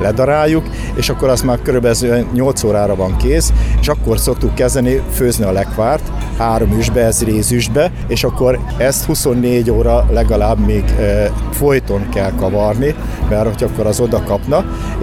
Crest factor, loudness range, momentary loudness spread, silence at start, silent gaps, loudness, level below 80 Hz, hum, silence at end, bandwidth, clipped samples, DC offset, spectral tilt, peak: 12 dB; 2 LU; 4 LU; 0 s; none; -14 LUFS; -20 dBFS; none; 0 s; 16 kHz; under 0.1%; under 0.1%; -5.5 dB/octave; -2 dBFS